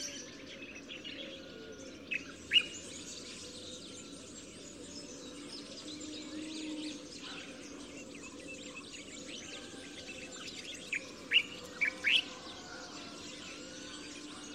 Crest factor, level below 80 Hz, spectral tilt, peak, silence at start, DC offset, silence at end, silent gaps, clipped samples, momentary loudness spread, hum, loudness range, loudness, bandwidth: 24 dB; -70 dBFS; -1 dB/octave; -16 dBFS; 0 s; under 0.1%; 0 s; none; under 0.1%; 18 LU; none; 12 LU; -38 LUFS; 16 kHz